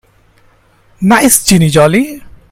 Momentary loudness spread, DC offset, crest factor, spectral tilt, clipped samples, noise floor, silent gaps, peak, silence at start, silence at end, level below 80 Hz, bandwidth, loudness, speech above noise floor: 9 LU; under 0.1%; 12 dB; -4.5 dB/octave; 0.4%; -48 dBFS; none; 0 dBFS; 1 s; 0.2 s; -36 dBFS; over 20 kHz; -9 LUFS; 40 dB